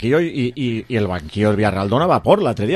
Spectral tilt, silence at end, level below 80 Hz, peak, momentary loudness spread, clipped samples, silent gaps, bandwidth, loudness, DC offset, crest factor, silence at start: -7.5 dB/octave; 0 s; -40 dBFS; 0 dBFS; 6 LU; under 0.1%; none; 12.5 kHz; -18 LUFS; under 0.1%; 18 dB; 0 s